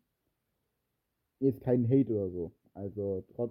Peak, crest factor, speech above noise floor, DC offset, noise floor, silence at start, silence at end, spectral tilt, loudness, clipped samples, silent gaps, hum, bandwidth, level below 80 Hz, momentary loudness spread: -14 dBFS; 18 dB; 52 dB; under 0.1%; -83 dBFS; 1.4 s; 0 s; -12.5 dB/octave; -31 LUFS; under 0.1%; none; none; 3.5 kHz; -66 dBFS; 15 LU